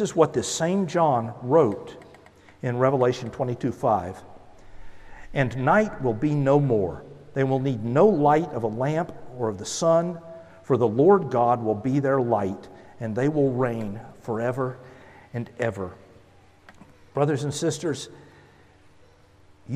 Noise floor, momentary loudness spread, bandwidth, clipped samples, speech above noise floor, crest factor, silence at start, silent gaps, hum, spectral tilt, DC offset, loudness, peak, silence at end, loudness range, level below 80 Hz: -54 dBFS; 15 LU; 13 kHz; under 0.1%; 31 dB; 20 dB; 0 s; none; none; -6.5 dB/octave; under 0.1%; -24 LUFS; -4 dBFS; 0 s; 8 LU; -54 dBFS